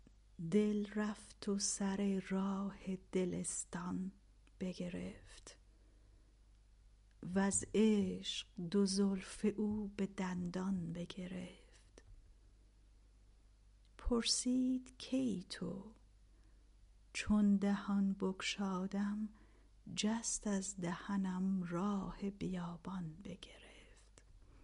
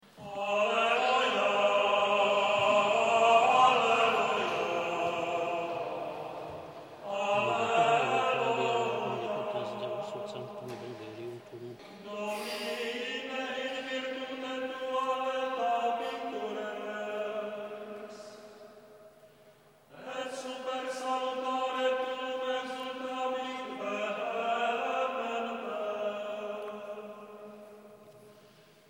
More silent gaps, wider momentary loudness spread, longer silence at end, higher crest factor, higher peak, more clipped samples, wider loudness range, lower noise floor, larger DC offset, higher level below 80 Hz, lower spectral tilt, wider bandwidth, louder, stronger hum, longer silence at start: neither; about the same, 15 LU vs 17 LU; second, 0.05 s vs 0.55 s; about the same, 18 dB vs 20 dB; second, -22 dBFS vs -12 dBFS; neither; second, 8 LU vs 14 LU; first, -65 dBFS vs -60 dBFS; neither; first, -60 dBFS vs -78 dBFS; first, -5 dB/octave vs -3.5 dB/octave; second, 11.5 kHz vs 16.5 kHz; second, -39 LUFS vs -31 LUFS; first, 50 Hz at -60 dBFS vs none; first, 0.35 s vs 0.15 s